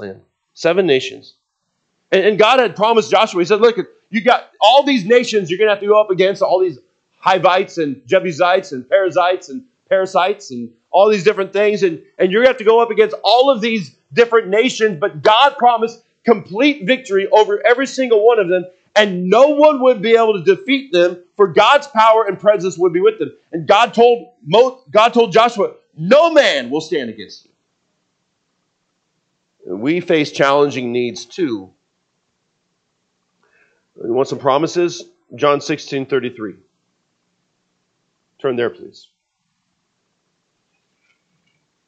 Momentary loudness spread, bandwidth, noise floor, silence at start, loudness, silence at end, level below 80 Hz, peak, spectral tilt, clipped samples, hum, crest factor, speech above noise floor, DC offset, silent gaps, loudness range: 11 LU; 8.6 kHz; -71 dBFS; 0 s; -14 LUFS; 3 s; -68 dBFS; 0 dBFS; -4.5 dB/octave; under 0.1%; none; 16 dB; 57 dB; under 0.1%; none; 13 LU